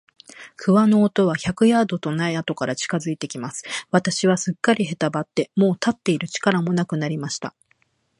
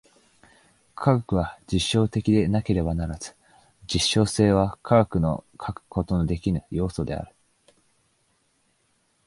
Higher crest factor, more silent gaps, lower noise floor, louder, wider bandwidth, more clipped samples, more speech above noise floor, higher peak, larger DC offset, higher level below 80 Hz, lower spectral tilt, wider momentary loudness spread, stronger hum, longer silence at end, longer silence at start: about the same, 20 dB vs 22 dB; neither; about the same, -65 dBFS vs -68 dBFS; first, -21 LUFS vs -24 LUFS; about the same, 11.5 kHz vs 11.5 kHz; neither; about the same, 44 dB vs 45 dB; about the same, -2 dBFS vs -4 dBFS; neither; second, -60 dBFS vs -40 dBFS; about the same, -5.5 dB/octave vs -6 dB/octave; about the same, 11 LU vs 13 LU; neither; second, 0.7 s vs 2 s; second, 0.4 s vs 1 s